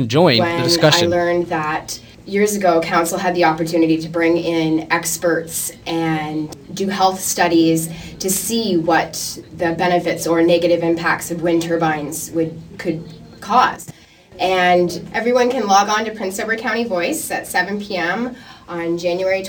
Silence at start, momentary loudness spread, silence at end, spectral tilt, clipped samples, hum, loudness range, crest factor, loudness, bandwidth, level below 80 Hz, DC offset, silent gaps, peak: 0 s; 11 LU; 0 s; -4 dB/octave; under 0.1%; none; 3 LU; 18 dB; -17 LUFS; 19 kHz; -50 dBFS; under 0.1%; none; 0 dBFS